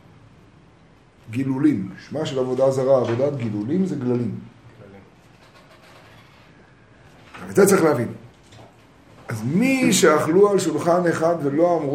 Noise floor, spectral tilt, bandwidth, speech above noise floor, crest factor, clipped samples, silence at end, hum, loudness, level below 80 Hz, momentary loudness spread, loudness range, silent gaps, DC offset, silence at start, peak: -52 dBFS; -5.5 dB/octave; 16 kHz; 33 dB; 18 dB; under 0.1%; 0 s; none; -20 LUFS; -60 dBFS; 14 LU; 9 LU; none; under 0.1%; 1.25 s; -4 dBFS